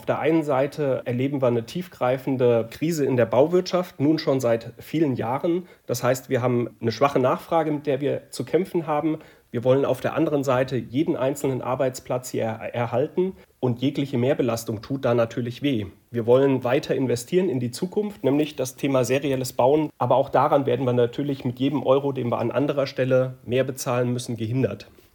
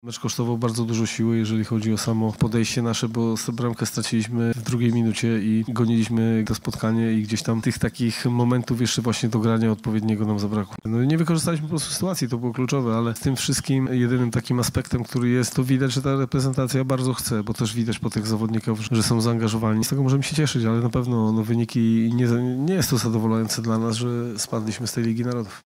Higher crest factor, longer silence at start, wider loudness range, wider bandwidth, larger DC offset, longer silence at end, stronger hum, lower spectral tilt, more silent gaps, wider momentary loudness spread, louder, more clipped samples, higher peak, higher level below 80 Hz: about the same, 18 dB vs 14 dB; about the same, 0 s vs 0.05 s; about the same, 3 LU vs 2 LU; first, 18 kHz vs 16 kHz; neither; first, 0.3 s vs 0.05 s; neither; about the same, -6.5 dB/octave vs -5.5 dB/octave; neither; first, 7 LU vs 4 LU; about the same, -24 LUFS vs -23 LUFS; neither; first, -4 dBFS vs -8 dBFS; second, -62 dBFS vs -50 dBFS